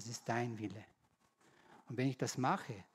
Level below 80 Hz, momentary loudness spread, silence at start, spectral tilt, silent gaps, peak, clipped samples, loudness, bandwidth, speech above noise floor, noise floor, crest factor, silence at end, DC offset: -86 dBFS; 10 LU; 0 s; -5.5 dB/octave; none; -22 dBFS; under 0.1%; -40 LUFS; 15.5 kHz; 35 dB; -74 dBFS; 20 dB; 0.1 s; under 0.1%